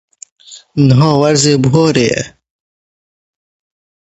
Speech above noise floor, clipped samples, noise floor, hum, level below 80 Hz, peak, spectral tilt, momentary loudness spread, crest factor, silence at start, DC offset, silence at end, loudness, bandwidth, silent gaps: over 80 dB; under 0.1%; under -90 dBFS; none; -46 dBFS; 0 dBFS; -5.5 dB/octave; 11 LU; 14 dB; 0.5 s; under 0.1%; 1.85 s; -11 LUFS; 8.4 kHz; none